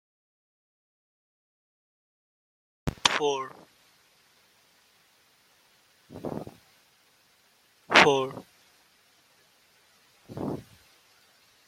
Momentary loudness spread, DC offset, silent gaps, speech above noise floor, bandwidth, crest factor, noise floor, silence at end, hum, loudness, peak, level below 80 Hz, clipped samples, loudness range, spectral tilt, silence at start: 26 LU; under 0.1%; none; 36 dB; 16 kHz; 32 dB; -64 dBFS; 1.05 s; none; -26 LUFS; 0 dBFS; -60 dBFS; under 0.1%; 19 LU; -3 dB/octave; 2.85 s